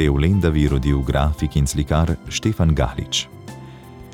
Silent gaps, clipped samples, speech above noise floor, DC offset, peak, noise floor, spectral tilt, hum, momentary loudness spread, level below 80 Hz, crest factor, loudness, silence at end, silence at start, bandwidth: none; under 0.1%; 20 dB; under 0.1%; -4 dBFS; -39 dBFS; -5.5 dB/octave; none; 20 LU; -26 dBFS; 16 dB; -20 LUFS; 0 s; 0 s; 16 kHz